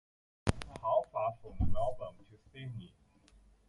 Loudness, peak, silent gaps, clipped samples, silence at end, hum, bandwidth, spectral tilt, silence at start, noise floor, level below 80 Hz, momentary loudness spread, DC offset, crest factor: -37 LUFS; -12 dBFS; none; under 0.1%; 0.8 s; none; 11.5 kHz; -6.5 dB/octave; 0.45 s; -64 dBFS; -46 dBFS; 16 LU; under 0.1%; 24 dB